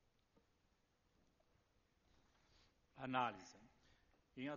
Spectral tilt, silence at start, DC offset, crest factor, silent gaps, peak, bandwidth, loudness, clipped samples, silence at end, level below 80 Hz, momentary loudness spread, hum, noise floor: -3.5 dB/octave; 2.95 s; under 0.1%; 26 dB; none; -26 dBFS; 7 kHz; -45 LUFS; under 0.1%; 0 s; -82 dBFS; 20 LU; none; -81 dBFS